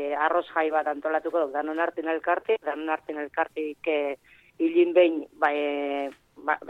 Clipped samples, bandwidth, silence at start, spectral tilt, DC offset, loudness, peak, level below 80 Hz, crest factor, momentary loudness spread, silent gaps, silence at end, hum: under 0.1%; 4.3 kHz; 0 s; -5 dB/octave; under 0.1%; -26 LUFS; -8 dBFS; -74 dBFS; 18 dB; 9 LU; none; 0 s; none